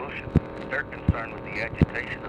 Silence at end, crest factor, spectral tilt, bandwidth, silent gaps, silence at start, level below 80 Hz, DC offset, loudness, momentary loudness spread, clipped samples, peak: 0 s; 22 dB; -8.5 dB/octave; 8.8 kHz; none; 0 s; -38 dBFS; under 0.1%; -28 LUFS; 6 LU; under 0.1%; -6 dBFS